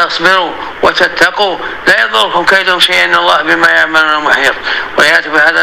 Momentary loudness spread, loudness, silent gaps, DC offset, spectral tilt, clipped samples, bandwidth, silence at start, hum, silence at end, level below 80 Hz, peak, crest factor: 6 LU; -8 LUFS; none; 1%; -2 dB/octave; 1%; 17.5 kHz; 0 s; none; 0 s; -44 dBFS; 0 dBFS; 10 dB